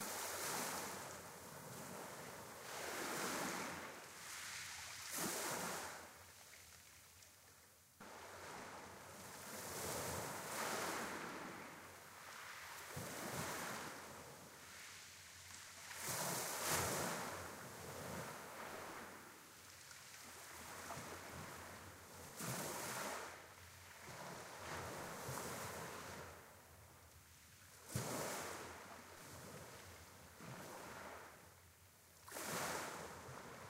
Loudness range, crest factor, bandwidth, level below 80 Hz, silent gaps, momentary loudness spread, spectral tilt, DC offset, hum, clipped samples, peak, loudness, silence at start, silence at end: 9 LU; 24 dB; 16 kHz; -76 dBFS; none; 16 LU; -2.5 dB/octave; under 0.1%; none; under 0.1%; -26 dBFS; -48 LUFS; 0 s; 0 s